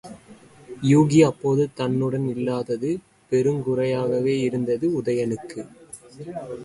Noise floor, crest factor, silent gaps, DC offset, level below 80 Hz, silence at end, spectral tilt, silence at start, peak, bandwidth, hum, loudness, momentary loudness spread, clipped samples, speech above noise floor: -48 dBFS; 18 dB; none; under 0.1%; -60 dBFS; 0 s; -7 dB/octave; 0.05 s; -4 dBFS; 11.5 kHz; none; -22 LUFS; 20 LU; under 0.1%; 27 dB